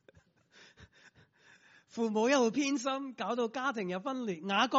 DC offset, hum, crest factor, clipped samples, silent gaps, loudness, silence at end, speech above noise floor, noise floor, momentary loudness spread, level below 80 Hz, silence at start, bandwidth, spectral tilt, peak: under 0.1%; none; 20 dB; under 0.1%; none; -33 LUFS; 0 s; 33 dB; -65 dBFS; 9 LU; -80 dBFS; 0.8 s; 7.6 kHz; -2.5 dB/octave; -14 dBFS